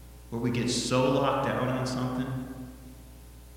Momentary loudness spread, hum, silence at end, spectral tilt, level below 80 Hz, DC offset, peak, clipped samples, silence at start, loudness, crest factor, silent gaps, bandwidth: 23 LU; none; 0 s; -5 dB/octave; -50 dBFS; under 0.1%; -12 dBFS; under 0.1%; 0 s; -29 LUFS; 18 dB; none; 17 kHz